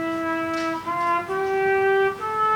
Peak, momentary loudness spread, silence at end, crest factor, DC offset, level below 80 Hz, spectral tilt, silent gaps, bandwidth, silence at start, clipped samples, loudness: -12 dBFS; 6 LU; 0 s; 10 dB; under 0.1%; -60 dBFS; -5 dB/octave; none; 17.5 kHz; 0 s; under 0.1%; -23 LUFS